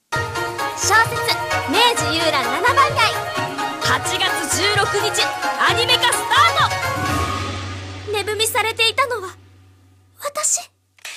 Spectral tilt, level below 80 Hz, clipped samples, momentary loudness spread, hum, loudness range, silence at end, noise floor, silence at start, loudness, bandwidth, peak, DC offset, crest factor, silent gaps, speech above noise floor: -2 dB/octave; -46 dBFS; under 0.1%; 10 LU; none; 4 LU; 0 s; -51 dBFS; 0.1 s; -17 LUFS; 15.5 kHz; -2 dBFS; under 0.1%; 18 dB; none; 33 dB